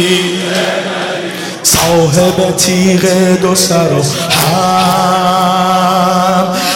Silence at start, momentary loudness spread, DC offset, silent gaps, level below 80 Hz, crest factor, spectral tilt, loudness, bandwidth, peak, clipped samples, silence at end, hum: 0 s; 5 LU; under 0.1%; none; -42 dBFS; 10 dB; -4 dB/octave; -10 LUFS; 17 kHz; 0 dBFS; under 0.1%; 0 s; none